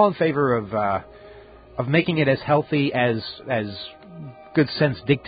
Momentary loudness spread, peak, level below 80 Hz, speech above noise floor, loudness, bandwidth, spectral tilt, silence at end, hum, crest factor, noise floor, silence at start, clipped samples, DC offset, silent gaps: 16 LU; -4 dBFS; -54 dBFS; 23 dB; -22 LUFS; 5 kHz; -11.5 dB/octave; 0 s; none; 18 dB; -45 dBFS; 0 s; under 0.1%; under 0.1%; none